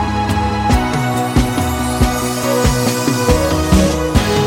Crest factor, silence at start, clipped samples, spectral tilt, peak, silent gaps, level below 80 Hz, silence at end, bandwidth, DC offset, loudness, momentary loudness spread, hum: 14 dB; 0 s; under 0.1%; -5 dB/octave; 0 dBFS; none; -22 dBFS; 0 s; 17 kHz; under 0.1%; -15 LUFS; 4 LU; none